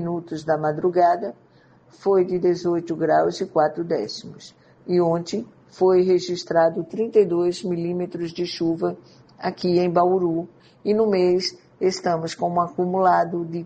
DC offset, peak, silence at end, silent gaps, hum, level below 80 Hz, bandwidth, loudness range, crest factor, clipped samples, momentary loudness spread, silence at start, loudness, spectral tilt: under 0.1%; -4 dBFS; 0 s; none; none; -64 dBFS; 8.8 kHz; 2 LU; 16 dB; under 0.1%; 11 LU; 0 s; -22 LUFS; -6.5 dB/octave